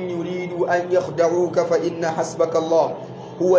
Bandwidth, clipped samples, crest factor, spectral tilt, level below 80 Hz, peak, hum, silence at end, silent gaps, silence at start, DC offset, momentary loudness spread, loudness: 8 kHz; under 0.1%; 16 dB; -6 dB/octave; -62 dBFS; -4 dBFS; none; 0 s; none; 0 s; under 0.1%; 8 LU; -21 LUFS